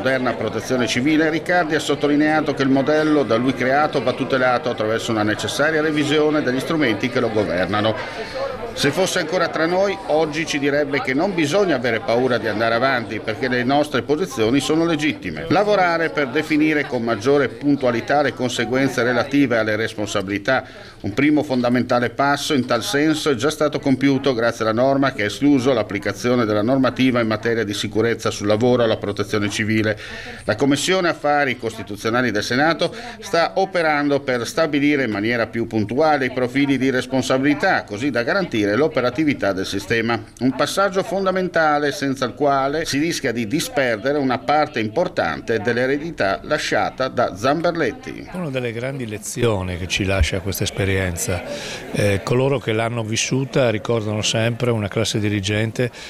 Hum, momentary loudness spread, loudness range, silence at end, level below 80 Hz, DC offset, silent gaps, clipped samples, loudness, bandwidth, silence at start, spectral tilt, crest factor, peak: none; 5 LU; 2 LU; 0 s; -44 dBFS; under 0.1%; none; under 0.1%; -19 LUFS; 15 kHz; 0 s; -5 dB/octave; 14 dB; -6 dBFS